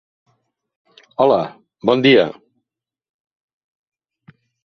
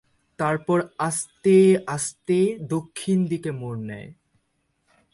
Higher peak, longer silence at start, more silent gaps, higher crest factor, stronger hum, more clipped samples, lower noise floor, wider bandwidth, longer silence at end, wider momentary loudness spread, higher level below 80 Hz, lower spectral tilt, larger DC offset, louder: first, 0 dBFS vs -6 dBFS; first, 1.2 s vs 0.4 s; neither; about the same, 20 dB vs 18 dB; neither; neither; first, -85 dBFS vs -72 dBFS; second, 6.4 kHz vs 11.5 kHz; first, 2.35 s vs 1 s; about the same, 15 LU vs 15 LU; about the same, -62 dBFS vs -64 dBFS; about the same, -7 dB/octave vs -6 dB/octave; neither; first, -16 LUFS vs -23 LUFS